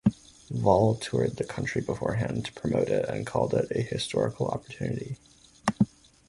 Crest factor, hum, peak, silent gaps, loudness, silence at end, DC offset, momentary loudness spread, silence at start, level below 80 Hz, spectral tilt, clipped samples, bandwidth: 22 dB; none; -6 dBFS; none; -28 LUFS; 0.45 s; under 0.1%; 9 LU; 0.05 s; -52 dBFS; -6.5 dB/octave; under 0.1%; 11.5 kHz